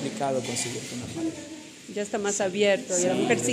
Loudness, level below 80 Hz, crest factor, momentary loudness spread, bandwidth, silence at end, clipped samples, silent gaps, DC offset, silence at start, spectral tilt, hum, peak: -27 LUFS; -68 dBFS; 18 dB; 13 LU; 15.5 kHz; 0 s; under 0.1%; none; under 0.1%; 0 s; -3.5 dB/octave; none; -8 dBFS